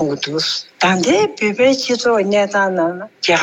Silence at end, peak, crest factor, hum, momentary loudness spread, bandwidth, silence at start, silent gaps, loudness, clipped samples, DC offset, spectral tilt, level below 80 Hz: 0 s; -4 dBFS; 12 dB; none; 5 LU; 16.5 kHz; 0 s; none; -16 LUFS; under 0.1%; under 0.1%; -4 dB/octave; -60 dBFS